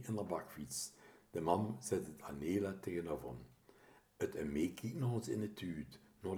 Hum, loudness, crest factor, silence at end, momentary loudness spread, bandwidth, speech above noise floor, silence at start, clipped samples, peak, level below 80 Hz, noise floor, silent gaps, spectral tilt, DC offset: none; -42 LUFS; 24 dB; 0 s; 11 LU; over 20 kHz; 25 dB; 0 s; under 0.1%; -18 dBFS; -66 dBFS; -66 dBFS; none; -6 dB/octave; under 0.1%